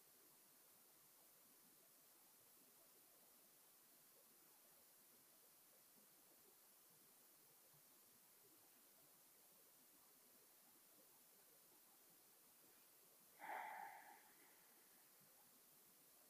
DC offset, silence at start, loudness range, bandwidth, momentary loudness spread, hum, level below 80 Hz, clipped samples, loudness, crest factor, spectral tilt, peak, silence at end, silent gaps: under 0.1%; 0 s; 8 LU; 15.5 kHz; 6 LU; none; under -90 dBFS; under 0.1%; -66 LUFS; 26 dB; -1 dB/octave; -40 dBFS; 0 s; none